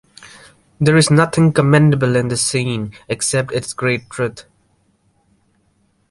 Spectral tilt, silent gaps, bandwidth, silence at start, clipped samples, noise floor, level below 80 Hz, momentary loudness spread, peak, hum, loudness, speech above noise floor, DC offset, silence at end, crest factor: -5 dB/octave; none; 11.5 kHz; 0.25 s; under 0.1%; -61 dBFS; -50 dBFS; 11 LU; -2 dBFS; none; -16 LUFS; 46 dB; under 0.1%; 1.7 s; 16 dB